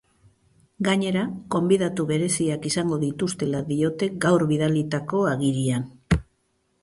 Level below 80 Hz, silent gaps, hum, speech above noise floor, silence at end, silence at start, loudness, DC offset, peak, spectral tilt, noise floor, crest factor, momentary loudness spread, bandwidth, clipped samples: -44 dBFS; none; none; 47 dB; 0.6 s; 0.8 s; -24 LUFS; under 0.1%; -6 dBFS; -5.5 dB/octave; -70 dBFS; 18 dB; 5 LU; 11.5 kHz; under 0.1%